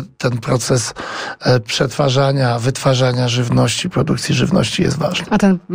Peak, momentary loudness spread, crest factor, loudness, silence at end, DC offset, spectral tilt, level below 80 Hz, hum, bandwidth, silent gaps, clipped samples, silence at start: -2 dBFS; 5 LU; 14 dB; -16 LUFS; 0 s; 0.3%; -5 dB/octave; -42 dBFS; none; 16 kHz; none; under 0.1%; 0 s